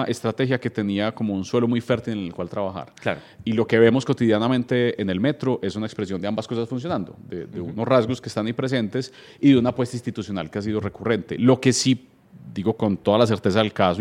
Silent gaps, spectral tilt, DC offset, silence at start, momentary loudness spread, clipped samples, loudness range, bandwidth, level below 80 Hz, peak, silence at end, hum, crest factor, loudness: none; -6 dB/octave; under 0.1%; 0 s; 11 LU; under 0.1%; 4 LU; 12.5 kHz; -62 dBFS; -2 dBFS; 0 s; none; 20 dB; -23 LUFS